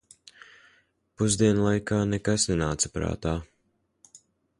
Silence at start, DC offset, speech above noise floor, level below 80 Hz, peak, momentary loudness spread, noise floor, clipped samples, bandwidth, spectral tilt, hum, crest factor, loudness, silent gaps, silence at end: 1.2 s; under 0.1%; 47 dB; -44 dBFS; -10 dBFS; 8 LU; -72 dBFS; under 0.1%; 11.5 kHz; -4.5 dB/octave; none; 18 dB; -26 LUFS; none; 0.4 s